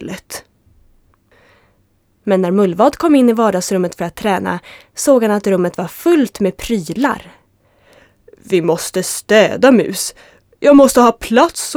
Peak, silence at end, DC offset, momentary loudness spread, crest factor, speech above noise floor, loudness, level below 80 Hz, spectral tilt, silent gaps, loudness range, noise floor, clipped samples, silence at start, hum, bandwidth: 0 dBFS; 0 s; under 0.1%; 13 LU; 14 dB; 45 dB; -14 LUFS; -46 dBFS; -5 dB/octave; none; 6 LU; -58 dBFS; under 0.1%; 0 s; none; over 20 kHz